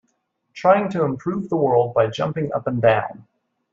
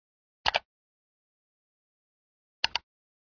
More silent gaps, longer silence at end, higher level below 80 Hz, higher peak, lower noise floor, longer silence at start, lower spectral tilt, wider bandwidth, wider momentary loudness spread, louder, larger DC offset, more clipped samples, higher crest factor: second, none vs 0.65-2.63 s; about the same, 0.5 s vs 0.6 s; first, -58 dBFS vs -64 dBFS; first, -2 dBFS vs -6 dBFS; second, -71 dBFS vs under -90 dBFS; about the same, 0.55 s vs 0.45 s; first, -7.5 dB/octave vs 2.5 dB/octave; first, 7.4 kHz vs 5.4 kHz; first, 7 LU vs 4 LU; first, -20 LUFS vs -31 LUFS; neither; neither; second, 18 dB vs 34 dB